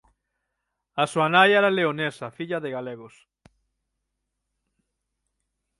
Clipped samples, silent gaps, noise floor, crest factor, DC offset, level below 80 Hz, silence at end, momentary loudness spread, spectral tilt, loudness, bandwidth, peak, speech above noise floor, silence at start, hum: under 0.1%; none; -80 dBFS; 22 dB; under 0.1%; -72 dBFS; 2.7 s; 18 LU; -5 dB/octave; -22 LUFS; 11.5 kHz; -4 dBFS; 58 dB; 0.95 s; none